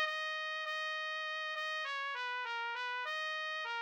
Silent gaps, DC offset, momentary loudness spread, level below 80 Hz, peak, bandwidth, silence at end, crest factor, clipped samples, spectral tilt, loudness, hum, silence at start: none; under 0.1%; 1 LU; under -90 dBFS; -24 dBFS; 18 kHz; 0 s; 16 dB; under 0.1%; 4 dB/octave; -38 LUFS; none; 0 s